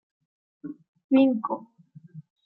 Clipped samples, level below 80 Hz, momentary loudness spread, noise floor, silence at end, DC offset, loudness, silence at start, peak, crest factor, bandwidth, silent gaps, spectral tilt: under 0.1%; -80 dBFS; 21 LU; -47 dBFS; 0.25 s; under 0.1%; -24 LUFS; 0.65 s; -10 dBFS; 18 dB; 4.3 kHz; 0.88-0.94 s, 1.04-1.09 s; -10 dB/octave